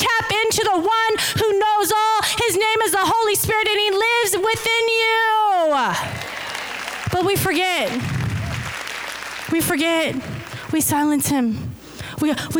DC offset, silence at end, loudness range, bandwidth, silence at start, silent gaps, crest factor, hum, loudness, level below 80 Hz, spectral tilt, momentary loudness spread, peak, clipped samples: under 0.1%; 0 s; 5 LU; over 20 kHz; 0 s; none; 8 dB; none; -19 LUFS; -46 dBFS; -3 dB/octave; 10 LU; -10 dBFS; under 0.1%